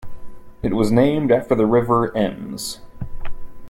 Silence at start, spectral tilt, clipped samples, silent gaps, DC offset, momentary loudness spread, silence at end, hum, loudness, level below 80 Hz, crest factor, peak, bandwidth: 0 s; -6.5 dB/octave; under 0.1%; none; under 0.1%; 19 LU; 0 s; none; -19 LUFS; -36 dBFS; 16 dB; -4 dBFS; 16.5 kHz